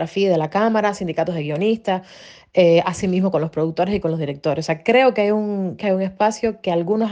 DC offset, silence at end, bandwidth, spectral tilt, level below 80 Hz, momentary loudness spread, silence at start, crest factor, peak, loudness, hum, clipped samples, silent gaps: under 0.1%; 0 s; 9.4 kHz; -6.5 dB/octave; -54 dBFS; 8 LU; 0 s; 16 dB; -4 dBFS; -19 LUFS; none; under 0.1%; none